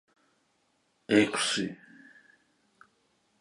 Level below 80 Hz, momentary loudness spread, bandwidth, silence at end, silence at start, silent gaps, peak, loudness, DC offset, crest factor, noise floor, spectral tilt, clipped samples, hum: -74 dBFS; 15 LU; 11.5 kHz; 1.65 s; 1.1 s; none; -8 dBFS; -27 LUFS; under 0.1%; 24 dB; -73 dBFS; -3.5 dB/octave; under 0.1%; none